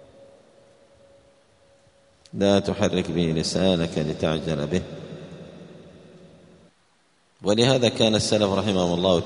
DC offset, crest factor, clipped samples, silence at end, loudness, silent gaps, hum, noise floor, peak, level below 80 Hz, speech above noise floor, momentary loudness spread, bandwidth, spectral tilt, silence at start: under 0.1%; 22 dB; under 0.1%; 0 s; -22 LUFS; none; none; -63 dBFS; -2 dBFS; -52 dBFS; 42 dB; 20 LU; 11 kHz; -5 dB/octave; 2.35 s